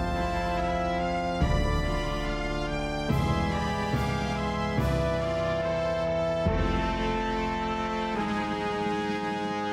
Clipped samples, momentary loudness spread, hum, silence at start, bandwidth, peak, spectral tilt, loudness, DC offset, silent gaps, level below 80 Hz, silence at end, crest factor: under 0.1%; 3 LU; none; 0 s; 15.5 kHz; -14 dBFS; -6.5 dB/octave; -28 LUFS; under 0.1%; none; -36 dBFS; 0 s; 14 dB